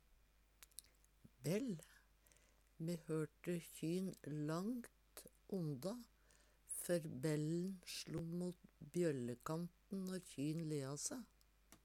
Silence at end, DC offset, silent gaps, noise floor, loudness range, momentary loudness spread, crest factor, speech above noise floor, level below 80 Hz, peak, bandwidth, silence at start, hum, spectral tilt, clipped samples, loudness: 0.1 s; under 0.1%; none; -73 dBFS; 3 LU; 17 LU; 18 dB; 28 dB; -74 dBFS; -28 dBFS; 17.5 kHz; 0.1 s; none; -5.5 dB/octave; under 0.1%; -46 LUFS